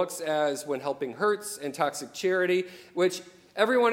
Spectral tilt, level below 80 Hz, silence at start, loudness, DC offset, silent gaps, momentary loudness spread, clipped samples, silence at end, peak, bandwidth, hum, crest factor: -3.5 dB/octave; -78 dBFS; 0 s; -28 LUFS; under 0.1%; none; 9 LU; under 0.1%; 0 s; -10 dBFS; 16.5 kHz; none; 18 dB